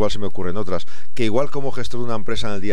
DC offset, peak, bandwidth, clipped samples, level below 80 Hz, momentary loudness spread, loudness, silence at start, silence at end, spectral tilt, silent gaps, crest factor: 30%; -4 dBFS; 15 kHz; under 0.1%; -44 dBFS; 7 LU; -25 LUFS; 0 s; 0 s; -6 dB/octave; none; 16 dB